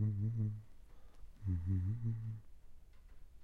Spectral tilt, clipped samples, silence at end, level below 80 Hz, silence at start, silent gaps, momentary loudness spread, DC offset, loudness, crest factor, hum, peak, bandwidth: -10.5 dB/octave; under 0.1%; 0 s; -58 dBFS; 0 s; none; 11 LU; under 0.1%; -41 LUFS; 14 dB; none; -28 dBFS; 2.3 kHz